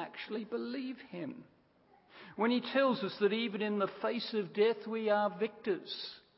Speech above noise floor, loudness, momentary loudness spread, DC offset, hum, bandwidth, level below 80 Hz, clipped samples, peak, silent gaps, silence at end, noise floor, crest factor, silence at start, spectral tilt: 33 dB; -35 LUFS; 13 LU; under 0.1%; none; 5.8 kHz; -84 dBFS; under 0.1%; -18 dBFS; none; 0.2 s; -67 dBFS; 18 dB; 0 s; -3 dB/octave